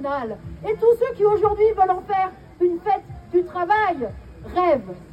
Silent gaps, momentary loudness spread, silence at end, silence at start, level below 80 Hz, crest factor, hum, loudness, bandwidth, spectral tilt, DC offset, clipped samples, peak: none; 10 LU; 0.05 s; 0 s; -46 dBFS; 14 dB; none; -21 LUFS; 8.6 kHz; -7.5 dB/octave; under 0.1%; under 0.1%; -6 dBFS